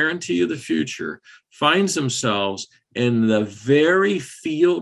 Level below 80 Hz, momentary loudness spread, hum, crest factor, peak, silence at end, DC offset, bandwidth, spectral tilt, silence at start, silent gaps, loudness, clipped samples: -62 dBFS; 12 LU; none; 18 dB; -4 dBFS; 0 s; under 0.1%; 12.5 kHz; -4.5 dB/octave; 0 s; none; -20 LUFS; under 0.1%